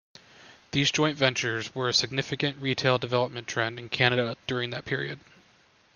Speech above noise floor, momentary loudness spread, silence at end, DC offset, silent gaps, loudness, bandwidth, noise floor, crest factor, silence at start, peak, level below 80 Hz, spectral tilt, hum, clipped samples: 34 dB; 7 LU; 0.75 s; under 0.1%; none; -27 LUFS; 10 kHz; -61 dBFS; 24 dB; 0.4 s; -4 dBFS; -64 dBFS; -4 dB/octave; none; under 0.1%